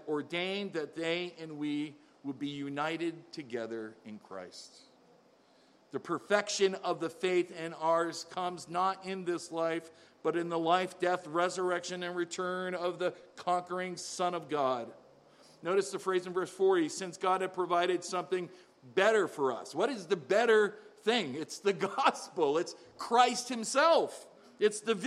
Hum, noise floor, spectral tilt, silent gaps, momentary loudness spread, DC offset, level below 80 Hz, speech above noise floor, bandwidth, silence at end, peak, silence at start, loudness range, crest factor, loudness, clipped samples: none; -64 dBFS; -4 dB/octave; none; 14 LU; under 0.1%; -86 dBFS; 32 dB; 13 kHz; 0 s; -12 dBFS; 0 s; 8 LU; 22 dB; -32 LUFS; under 0.1%